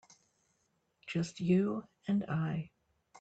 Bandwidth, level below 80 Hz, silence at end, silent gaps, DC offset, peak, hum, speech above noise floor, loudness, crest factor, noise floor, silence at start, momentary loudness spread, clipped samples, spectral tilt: 8.2 kHz; -70 dBFS; 0 s; none; under 0.1%; -18 dBFS; none; 45 dB; -35 LUFS; 18 dB; -78 dBFS; 1.05 s; 12 LU; under 0.1%; -7.5 dB/octave